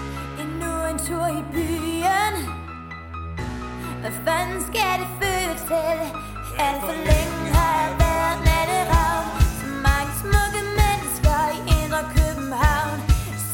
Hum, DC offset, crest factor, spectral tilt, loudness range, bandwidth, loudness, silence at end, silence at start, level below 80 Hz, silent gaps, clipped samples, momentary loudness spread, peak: none; under 0.1%; 18 dB; -4.5 dB/octave; 5 LU; 17 kHz; -22 LUFS; 0 s; 0 s; -26 dBFS; none; under 0.1%; 11 LU; -4 dBFS